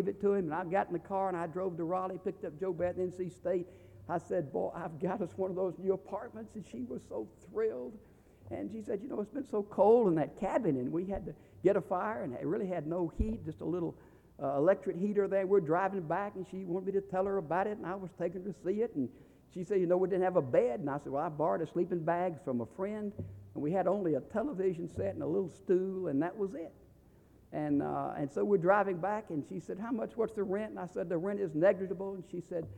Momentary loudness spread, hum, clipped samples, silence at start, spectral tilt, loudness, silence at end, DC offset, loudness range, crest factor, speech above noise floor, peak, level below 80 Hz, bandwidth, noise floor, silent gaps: 12 LU; none; under 0.1%; 0 s; -8.5 dB/octave; -34 LUFS; 0 s; under 0.1%; 5 LU; 20 dB; 28 dB; -14 dBFS; -58 dBFS; 9.8 kHz; -61 dBFS; none